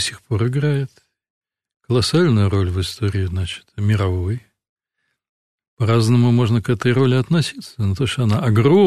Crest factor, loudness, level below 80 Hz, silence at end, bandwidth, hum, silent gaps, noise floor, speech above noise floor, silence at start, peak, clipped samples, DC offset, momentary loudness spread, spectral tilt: 14 dB; -18 LUFS; -44 dBFS; 0 s; 13 kHz; none; 1.30-1.41 s, 1.76-1.80 s, 4.69-4.76 s, 5.29-5.58 s, 5.68-5.77 s; -74 dBFS; 57 dB; 0 s; -4 dBFS; under 0.1%; under 0.1%; 9 LU; -6.5 dB/octave